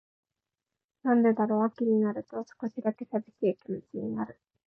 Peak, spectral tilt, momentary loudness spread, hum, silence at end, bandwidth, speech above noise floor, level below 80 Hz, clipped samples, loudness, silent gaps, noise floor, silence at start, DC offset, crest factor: -16 dBFS; -10 dB/octave; 13 LU; none; 0.4 s; 5.8 kHz; 61 dB; -76 dBFS; under 0.1%; -30 LUFS; none; -89 dBFS; 1.05 s; under 0.1%; 14 dB